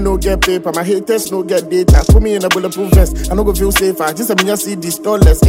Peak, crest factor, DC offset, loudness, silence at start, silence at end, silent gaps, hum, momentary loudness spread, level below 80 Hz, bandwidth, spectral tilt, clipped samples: 0 dBFS; 12 dB; under 0.1%; -13 LUFS; 0 s; 0 s; none; none; 6 LU; -16 dBFS; 16.5 kHz; -5 dB/octave; under 0.1%